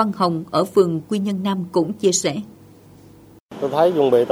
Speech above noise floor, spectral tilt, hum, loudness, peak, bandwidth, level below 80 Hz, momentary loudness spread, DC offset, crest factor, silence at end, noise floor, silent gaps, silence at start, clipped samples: 28 dB; -5 dB/octave; none; -19 LUFS; -2 dBFS; over 20 kHz; -62 dBFS; 11 LU; under 0.1%; 18 dB; 0 s; -47 dBFS; 3.40-3.49 s; 0 s; under 0.1%